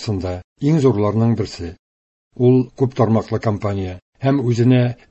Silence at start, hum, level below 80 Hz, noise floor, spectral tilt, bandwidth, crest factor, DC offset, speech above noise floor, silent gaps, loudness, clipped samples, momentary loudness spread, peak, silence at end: 0 s; none; -42 dBFS; under -90 dBFS; -8.5 dB/octave; 8.2 kHz; 16 dB; under 0.1%; over 73 dB; 0.44-0.56 s, 1.79-2.31 s, 4.02-4.13 s; -18 LUFS; under 0.1%; 11 LU; -2 dBFS; 0.15 s